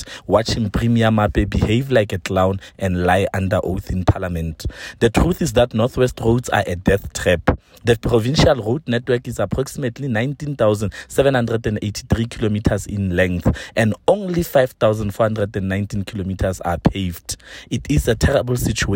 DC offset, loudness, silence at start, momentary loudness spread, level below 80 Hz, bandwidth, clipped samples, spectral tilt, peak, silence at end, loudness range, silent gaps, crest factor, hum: under 0.1%; -19 LUFS; 0 s; 8 LU; -32 dBFS; 17 kHz; under 0.1%; -6 dB/octave; -2 dBFS; 0 s; 2 LU; none; 16 dB; none